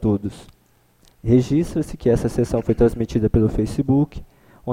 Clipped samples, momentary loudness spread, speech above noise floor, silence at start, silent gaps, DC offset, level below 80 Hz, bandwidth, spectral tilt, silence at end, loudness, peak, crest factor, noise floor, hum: under 0.1%; 10 LU; 39 dB; 0 s; none; under 0.1%; -34 dBFS; 15.5 kHz; -8.5 dB/octave; 0 s; -20 LUFS; -4 dBFS; 16 dB; -58 dBFS; none